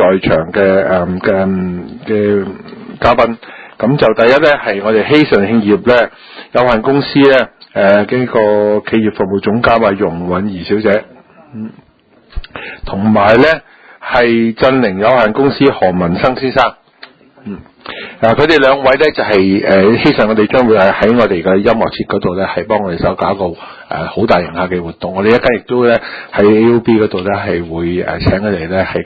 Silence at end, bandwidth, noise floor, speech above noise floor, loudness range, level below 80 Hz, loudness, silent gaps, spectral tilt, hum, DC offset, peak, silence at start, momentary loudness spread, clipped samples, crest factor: 0 s; 8 kHz; -46 dBFS; 35 dB; 4 LU; -36 dBFS; -11 LUFS; none; -8 dB/octave; none; under 0.1%; 0 dBFS; 0 s; 13 LU; 0.2%; 12 dB